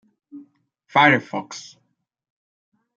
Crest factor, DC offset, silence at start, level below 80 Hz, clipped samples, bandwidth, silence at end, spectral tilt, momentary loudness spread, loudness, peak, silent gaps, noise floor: 22 dB; under 0.1%; 0.35 s; -72 dBFS; under 0.1%; 7.6 kHz; 1.35 s; -4.5 dB/octave; 21 LU; -18 LUFS; -2 dBFS; none; -58 dBFS